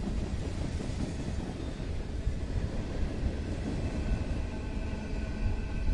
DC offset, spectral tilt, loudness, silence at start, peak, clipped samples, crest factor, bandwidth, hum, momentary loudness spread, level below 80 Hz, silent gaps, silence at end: under 0.1%; -7 dB/octave; -36 LUFS; 0 s; -18 dBFS; under 0.1%; 14 dB; 11 kHz; none; 3 LU; -36 dBFS; none; 0 s